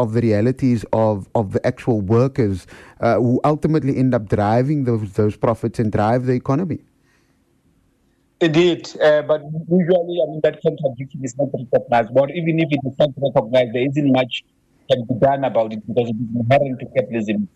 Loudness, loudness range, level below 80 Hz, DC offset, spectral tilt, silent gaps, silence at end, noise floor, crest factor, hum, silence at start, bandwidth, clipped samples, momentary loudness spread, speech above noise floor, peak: -19 LUFS; 2 LU; -50 dBFS; under 0.1%; -7.5 dB/octave; none; 0.1 s; -61 dBFS; 12 dB; none; 0 s; 11 kHz; under 0.1%; 6 LU; 43 dB; -6 dBFS